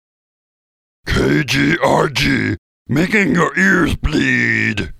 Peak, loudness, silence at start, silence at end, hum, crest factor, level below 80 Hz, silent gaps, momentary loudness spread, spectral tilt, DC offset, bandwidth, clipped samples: 0 dBFS; -15 LUFS; 1.05 s; 0 s; none; 16 dB; -32 dBFS; 2.58-2.85 s; 8 LU; -5 dB/octave; under 0.1%; 15.5 kHz; under 0.1%